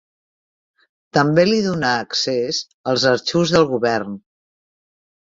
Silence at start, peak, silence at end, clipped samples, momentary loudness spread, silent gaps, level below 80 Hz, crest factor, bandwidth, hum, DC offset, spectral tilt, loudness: 1.15 s; -2 dBFS; 1.15 s; under 0.1%; 8 LU; 2.74-2.84 s; -56 dBFS; 18 dB; 7.8 kHz; none; under 0.1%; -4.5 dB/octave; -18 LUFS